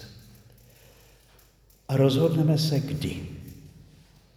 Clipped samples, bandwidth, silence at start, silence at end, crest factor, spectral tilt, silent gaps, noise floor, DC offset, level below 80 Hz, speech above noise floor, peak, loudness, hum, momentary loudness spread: under 0.1%; 15.5 kHz; 0 s; 0.7 s; 20 dB; -7 dB/octave; none; -58 dBFS; under 0.1%; -54 dBFS; 35 dB; -8 dBFS; -25 LUFS; none; 25 LU